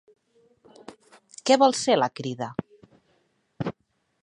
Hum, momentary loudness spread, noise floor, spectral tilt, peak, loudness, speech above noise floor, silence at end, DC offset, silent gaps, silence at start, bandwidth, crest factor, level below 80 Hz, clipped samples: none; 15 LU; -70 dBFS; -4 dB/octave; -6 dBFS; -24 LUFS; 48 dB; 0.55 s; under 0.1%; none; 0.9 s; 11 kHz; 22 dB; -66 dBFS; under 0.1%